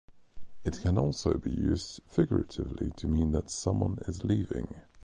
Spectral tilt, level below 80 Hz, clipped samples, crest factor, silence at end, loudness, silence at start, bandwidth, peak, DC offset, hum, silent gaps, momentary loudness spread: -7 dB/octave; -40 dBFS; under 0.1%; 18 dB; 0 s; -31 LUFS; 0.1 s; 10.5 kHz; -12 dBFS; under 0.1%; none; none; 8 LU